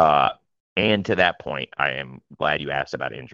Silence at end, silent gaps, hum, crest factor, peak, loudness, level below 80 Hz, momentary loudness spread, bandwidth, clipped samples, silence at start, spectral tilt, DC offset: 0.05 s; 0.60-0.76 s; none; 20 dB; -2 dBFS; -23 LUFS; -54 dBFS; 11 LU; 7.4 kHz; under 0.1%; 0 s; -6 dB/octave; under 0.1%